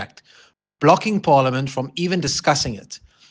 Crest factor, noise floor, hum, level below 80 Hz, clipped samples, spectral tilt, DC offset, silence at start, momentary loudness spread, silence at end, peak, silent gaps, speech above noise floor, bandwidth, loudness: 20 dB; -54 dBFS; none; -52 dBFS; under 0.1%; -4.5 dB/octave; under 0.1%; 0 s; 19 LU; 0.35 s; 0 dBFS; none; 35 dB; 10 kHz; -19 LUFS